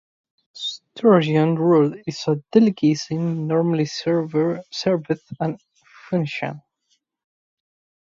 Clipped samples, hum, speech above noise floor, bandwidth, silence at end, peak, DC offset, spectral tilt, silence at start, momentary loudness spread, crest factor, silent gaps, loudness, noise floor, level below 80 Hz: under 0.1%; none; 50 dB; 7.6 kHz; 1.45 s; -2 dBFS; under 0.1%; -7 dB/octave; 0.55 s; 13 LU; 20 dB; none; -21 LUFS; -69 dBFS; -66 dBFS